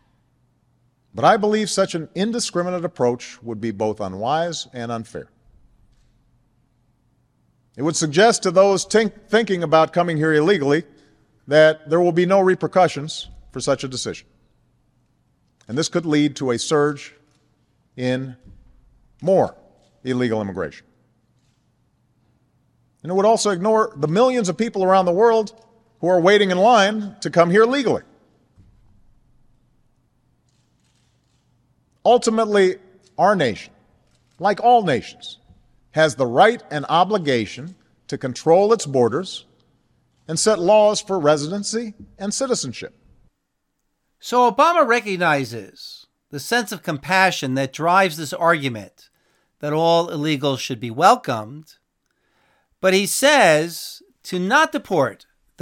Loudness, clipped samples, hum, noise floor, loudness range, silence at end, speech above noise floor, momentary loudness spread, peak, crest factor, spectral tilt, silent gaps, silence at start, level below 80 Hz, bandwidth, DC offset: -19 LUFS; under 0.1%; none; -74 dBFS; 8 LU; 0.5 s; 55 dB; 16 LU; 0 dBFS; 20 dB; -4.5 dB/octave; none; 1.15 s; -60 dBFS; 17.5 kHz; under 0.1%